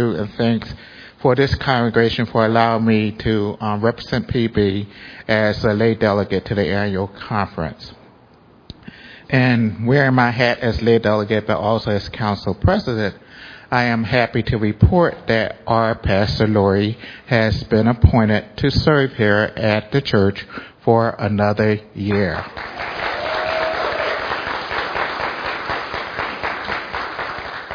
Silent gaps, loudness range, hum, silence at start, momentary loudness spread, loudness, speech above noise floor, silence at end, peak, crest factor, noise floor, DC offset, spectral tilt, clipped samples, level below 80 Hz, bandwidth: none; 5 LU; none; 0 s; 11 LU; -18 LUFS; 31 dB; 0 s; 0 dBFS; 18 dB; -49 dBFS; under 0.1%; -7.5 dB/octave; under 0.1%; -36 dBFS; 5.4 kHz